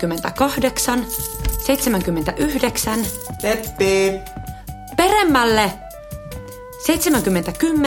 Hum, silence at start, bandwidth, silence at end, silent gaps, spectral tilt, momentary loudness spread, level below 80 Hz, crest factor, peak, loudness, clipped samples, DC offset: none; 0 s; 17 kHz; 0 s; none; -4 dB/octave; 18 LU; -34 dBFS; 18 dB; 0 dBFS; -19 LUFS; under 0.1%; under 0.1%